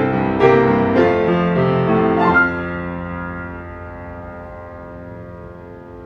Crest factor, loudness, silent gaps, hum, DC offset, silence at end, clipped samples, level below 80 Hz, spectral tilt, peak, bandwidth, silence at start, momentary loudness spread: 18 dB; -16 LUFS; none; none; under 0.1%; 0 s; under 0.1%; -42 dBFS; -9 dB/octave; 0 dBFS; 6.6 kHz; 0 s; 21 LU